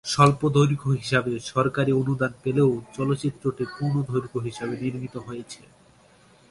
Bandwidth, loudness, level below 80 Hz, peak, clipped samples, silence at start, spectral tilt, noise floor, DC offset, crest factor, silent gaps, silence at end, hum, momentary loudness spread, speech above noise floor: 11.5 kHz; -24 LUFS; -56 dBFS; -2 dBFS; under 0.1%; 0.05 s; -6.5 dB/octave; -56 dBFS; under 0.1%; 22 dB; none; 0.95 s; none; 14 LU; 32 dB